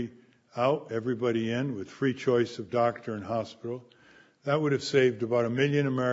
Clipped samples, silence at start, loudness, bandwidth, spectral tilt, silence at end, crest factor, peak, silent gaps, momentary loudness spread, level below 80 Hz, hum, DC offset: under 0.1%; 0 s; -29 LUFS; 8 kHz; -6.5 dB/octave; 0 s; 18 dB; -10 dBFS; none; 13 LU; -72 dBFS; none; under 0.1%